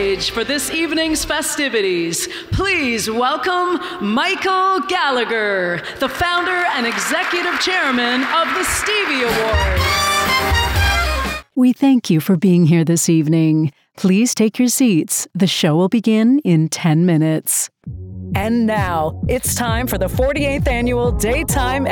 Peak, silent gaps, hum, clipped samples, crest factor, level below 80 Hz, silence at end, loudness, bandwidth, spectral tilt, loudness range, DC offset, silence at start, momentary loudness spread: -4 dBFS; none; none; under 0.1%; 12 dB; -30 dBFS; 0 s; -16 LUFS; 19 kHz; -4.5 dB/octave; 3 LU; under 0.1%; 0 s; 6 LU